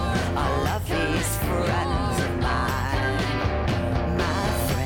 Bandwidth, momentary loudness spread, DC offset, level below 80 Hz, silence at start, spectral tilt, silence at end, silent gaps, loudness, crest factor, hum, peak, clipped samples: 19 kHz; 1 LU; under 0.1%; -32 dBFS; 0 s; -5.5 dB/octave; 0 s; none; -25 LUFS; 12 dB; none; -10 dBFS; under 0.1%